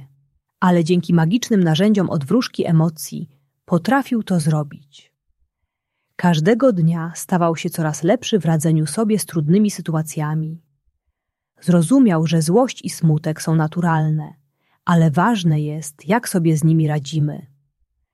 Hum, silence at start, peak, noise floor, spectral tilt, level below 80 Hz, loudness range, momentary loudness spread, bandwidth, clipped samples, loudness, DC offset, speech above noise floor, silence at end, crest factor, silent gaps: none; 0 s; -2 dBFS; -76 dBFS; -6.5 dB/octave; -60 dBFS; 3 LU; 10 LU; 13.5 kHz; under 0.1%; -18 LUFS; under 0.1%; 59 dB; 0.75 s; 16 dB; none